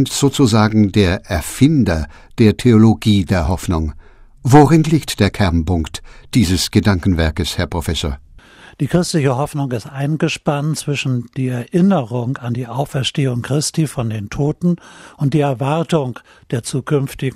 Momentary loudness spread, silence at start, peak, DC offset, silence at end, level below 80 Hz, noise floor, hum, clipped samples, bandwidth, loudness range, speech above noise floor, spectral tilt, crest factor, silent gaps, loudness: 11 LU; 0 s; 0 dBFS; under 0.1%; 0 s; -32 dBFS; -42 dBFS; none; under 0.1%; 16 kHz; 6 LU; 26 dB; -6 dB/octave; 16 dB; none; -16 LUFS